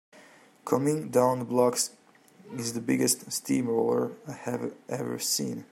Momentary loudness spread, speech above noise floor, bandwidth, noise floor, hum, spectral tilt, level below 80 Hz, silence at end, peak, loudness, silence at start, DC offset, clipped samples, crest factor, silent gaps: 10 LU; 28 dB; 16 kHz; -56 dBFS; none; -4 dB/octave; -74 dBFS; 0.1 s; -10 dBFS; -28 LUFS; 0.15 s; under 0.1%; under 0.1%; 20 dB; none